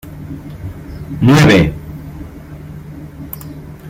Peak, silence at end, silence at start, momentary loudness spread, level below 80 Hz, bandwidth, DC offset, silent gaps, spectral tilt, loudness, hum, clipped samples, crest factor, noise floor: 0 dBFS; 0 s; 0.05 s; 23 LU; -34 dBFS; 16 kHz; under 0.1%; none; -6.5 dB/octave; -10 LUFS; none; under 0.1%; 16 dB; -31 dBFS